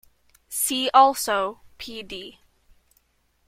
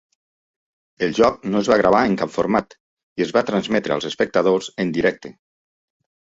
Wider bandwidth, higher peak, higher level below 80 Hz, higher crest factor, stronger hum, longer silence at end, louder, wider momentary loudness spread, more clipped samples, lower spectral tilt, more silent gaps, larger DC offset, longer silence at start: first, 16.5 kHz vs 8 kHz; about the same, -4 dBFS vs -2 dBFS; second, -60 dBFS vs -54 dBFS; about the same, 22 dB vs 18 dB; neither; about the same, 1.15 s vs 1.05 s; about the same, -21 LUFS vs -19 LUFS; first, 20 LU vs 8 LU; neither; second, -1 dB/octave vs -5.5 dB/octave; second, none vs 2.80-2.97 s, 3.03-3.16 s; neither; second, 0.5 s vs 1 s